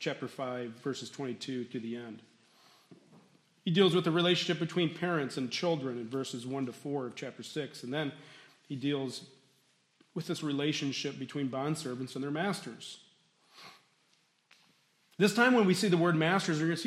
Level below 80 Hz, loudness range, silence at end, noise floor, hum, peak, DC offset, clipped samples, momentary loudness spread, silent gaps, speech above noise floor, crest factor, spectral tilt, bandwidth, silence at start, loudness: -80 dBFS; 9 LU; 0 s; -71 dBFS; none; -10 dBFS; under 0.1%; under 0.1%; 18 LU; none; 39 dB; 22 dB; -5 dB/octave; 14 kHz; 0 s; -32 LUFS